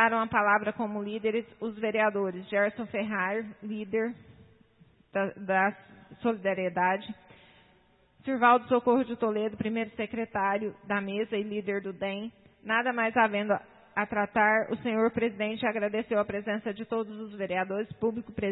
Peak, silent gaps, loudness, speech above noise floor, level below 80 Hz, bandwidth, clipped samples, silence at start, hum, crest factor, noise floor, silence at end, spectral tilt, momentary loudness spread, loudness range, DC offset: -10 dBFS; none; -29 LUFS; 35 dB; -66 dBFS; 4.1 kHz; under 0.1%; 0 s; none; 20 dB; -64 dBFS; 0 s; -9.5 dB/octave; 10 LU; 4 LU; under 0.1%